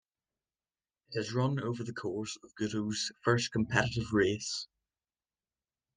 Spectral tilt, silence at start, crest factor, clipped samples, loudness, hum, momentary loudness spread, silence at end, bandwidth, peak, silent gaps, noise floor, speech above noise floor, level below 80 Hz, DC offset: -5 dB/octave; 1.1 s; 24 dB; under 0.1%; -33 LUFS; none; 9 LU; 1.3 s; 10 kHz; -12 dBFS; none; under -90 dBFS; over 57 dB; -62 dBFS; under 0.1%